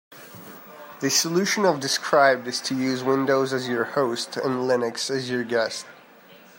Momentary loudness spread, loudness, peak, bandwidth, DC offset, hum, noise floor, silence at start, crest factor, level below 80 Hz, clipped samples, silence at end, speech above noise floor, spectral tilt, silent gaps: 22 LU; -23 LUFS; -4 dBFS; 16 kHz; under 0.1%; none; -50 dBFS; 0.1 s; 20 dB; -74 dBFS; under 0.1%; 0.2 s; 27 dB; -3 dB/octave; none